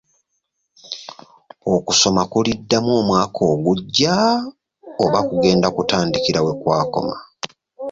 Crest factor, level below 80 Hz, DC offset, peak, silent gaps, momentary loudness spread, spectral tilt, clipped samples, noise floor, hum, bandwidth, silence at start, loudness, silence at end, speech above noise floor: 16 dB; -50 dBFS; under 0.1%; -2 dBFS; none; 17 LU; -4.5 dB/octave; under 0.1%; -73 dBFS; none; 7.8 kHz; 0.85 s; -18 LUFS; 0 s; 56 dB